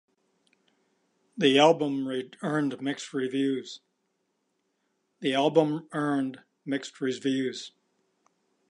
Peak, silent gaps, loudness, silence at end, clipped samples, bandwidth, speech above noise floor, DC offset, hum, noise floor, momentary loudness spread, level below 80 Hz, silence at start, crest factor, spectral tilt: -6 dBFS; none; -27 LUFS; 1 s; under 0.1%; 11 kHz; 50 dB; under 0.1%; none; -77 dBFS; 16 LU; -84 dBFS; 1.35 s; 22 dB; -5 dB/octave